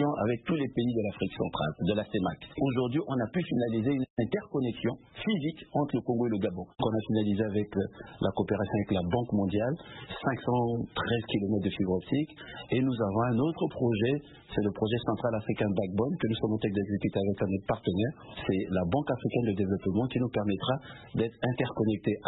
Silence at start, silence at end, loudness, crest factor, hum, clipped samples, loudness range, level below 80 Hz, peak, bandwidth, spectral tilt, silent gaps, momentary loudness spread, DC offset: 0 s; 0 s; -31 LUFS; 16 dB; none; under 0.1%; 1 LU; -56 dBFS; -14 dBFS; 4.1 kHz; -11 dB/octave; 4.10-4.16 s; 5 LU; under 0.1%